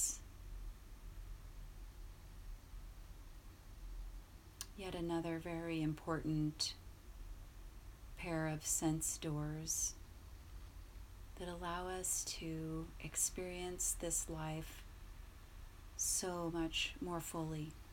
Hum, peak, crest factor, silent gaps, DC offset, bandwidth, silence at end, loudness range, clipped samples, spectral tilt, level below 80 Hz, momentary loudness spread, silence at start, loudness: none; -24 dBFS; 20 dB; none; under 0.1%; 18 kHz; 0 s; 15 LU; under 0.1%; -3.5 dB/octave; -54 dBFS; 20 LU; 0 s; -41 LUFS